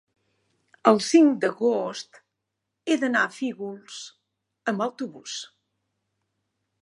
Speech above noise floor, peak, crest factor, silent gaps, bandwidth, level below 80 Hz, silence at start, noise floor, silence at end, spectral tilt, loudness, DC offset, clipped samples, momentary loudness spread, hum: 59 dB; -2 dBFS; 24 dB; none; 11.5 kHz; -80 dBFS; 0.85 s; -82 dBFS; 1.4 s; -4 dB/octave; -23 LUFS; under 0.1%; under 0.1%; 21 LU; none